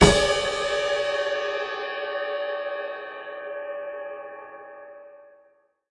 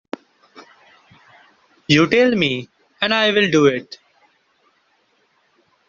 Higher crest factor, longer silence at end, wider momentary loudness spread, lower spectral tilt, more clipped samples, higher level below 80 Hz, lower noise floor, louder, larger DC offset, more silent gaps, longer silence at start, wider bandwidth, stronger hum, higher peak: about the same, 24 dB vs 20 dB; second, 0.6 s vs 2.05 s; second, 19 LU vs 22 LU; about the same, -4 dB/octave vs -3 dB/octave; neither; first, -40 dBFS vs -58 dBFS; about the same, -62 dBFS vs -62 dBFS; second, -27 LUFS vs -16 LUFS; neither; neither; second, 0 s vs 0.55 s; first, 11.5 kHz vs 7.6 kHz; neither; about the same, -2 dBFS vs 0 dBFS